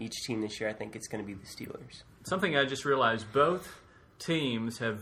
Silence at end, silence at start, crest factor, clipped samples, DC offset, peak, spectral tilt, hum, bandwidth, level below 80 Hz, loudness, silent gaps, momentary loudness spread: 0 s; 0 s; 20 dB; under 0.1%; under 0.1%; -12 dBFS; -4.5 dB/octave; none; 16.5 kHz; -64 dBFS; -31 LUFS; none; 16 LU